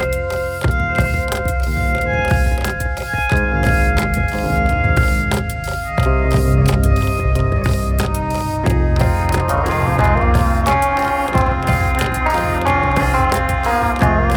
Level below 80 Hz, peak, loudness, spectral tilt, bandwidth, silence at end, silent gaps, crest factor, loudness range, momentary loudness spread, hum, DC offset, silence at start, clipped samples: -20 dBFS; -2 dBFS; -17 LUFS; -6 dB/octave; 19.5 kHz; 0 s; none; 14 dB; 2 LU; 5 LU; none; under 0.1%; 0 s; under 0.1%